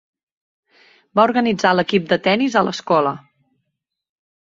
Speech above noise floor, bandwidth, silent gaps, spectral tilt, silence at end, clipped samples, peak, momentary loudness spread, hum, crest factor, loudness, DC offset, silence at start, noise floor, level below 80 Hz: 61 dB; 7.8 kHz; none; -5.5 dB/octave; 1.25 s; under 0.1%; -2 dBFS; 6 LU; none; 18 dB; -17 LUFS; under 0.1%; 1.15 s; -77 dBFS; -62 dBFS